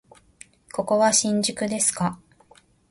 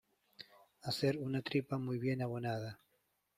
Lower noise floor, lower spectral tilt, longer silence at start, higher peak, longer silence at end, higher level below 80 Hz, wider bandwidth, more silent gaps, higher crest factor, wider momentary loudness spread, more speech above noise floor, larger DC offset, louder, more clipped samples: second, -56 dBFS vs -80 dBFS; second, -3 dB/octave vs -6.5 dB/octave; first, 0.75 s vs 0.4 s; first, -6 dBFS vs -20 dBFS; first, 0.75 s vs 0.6 s; first, -60 dBFS vs -74 dBFS; second, 12 kHz vs 15.5 kHz; neither; about the same, 18 dB vs 18 dB; second, 11 LU vs 20 LU; second, 34 dB vs 42 dB; neither; first, -22 LUFS vs -38 LUFS; neither